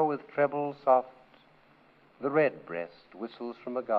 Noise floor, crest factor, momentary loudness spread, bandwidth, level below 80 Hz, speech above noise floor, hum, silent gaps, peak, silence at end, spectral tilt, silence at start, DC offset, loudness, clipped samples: -61 dBFS; 20 dB; 16 LU; 5.2 kHz; -78 dBFS; 31 dB; none; none; -12 dBFS; 0 s; -9.5 dB/octave; 0 s; under 0.1%; -30 LUFS; under 0.1%